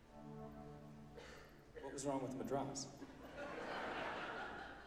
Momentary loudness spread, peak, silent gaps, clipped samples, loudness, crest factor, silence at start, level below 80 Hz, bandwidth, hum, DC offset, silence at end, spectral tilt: 14 LU; -30 dBFS; none; under 0.1%; -48 LUFS; 18 dB; 0 s; -68 dBFS; 15.5 kHz; none; under 0.1%; 0 s; -4 dB/octave